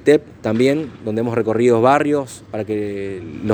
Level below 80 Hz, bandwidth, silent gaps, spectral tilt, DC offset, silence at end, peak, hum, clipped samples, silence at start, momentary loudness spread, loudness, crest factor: -54 dBFS; over 20 kHz; none; -6.5 dB/octave; under 0.1%; 0 s; 0 dBFS; none; under 0.1%; 0 s; 13 LU; -18 LUFS; 18 dB